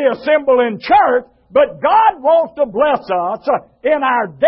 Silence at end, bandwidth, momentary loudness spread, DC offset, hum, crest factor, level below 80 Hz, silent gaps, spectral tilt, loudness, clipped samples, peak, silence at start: 0 s; 5.8 kHz; 7 LU; under 0.1%; none; 12 dB; -52 dBFS; none; -9.5 dB/octave; -14 LUFS; under 0.1%; 0 dBFS; 0 s